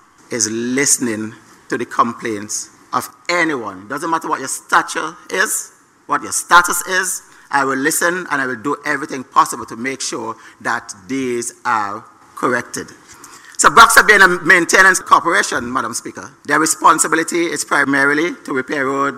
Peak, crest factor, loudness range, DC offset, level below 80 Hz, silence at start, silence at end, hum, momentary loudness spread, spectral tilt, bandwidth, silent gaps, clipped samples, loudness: 0 dBFS; 16 dB; 10 LU; under 0.1%; -52 dBFS; 0.3 s; 0 s; none; 16 LU; -2 dB/octave; 16 kHz; none; under 0.1%; -15 LUFS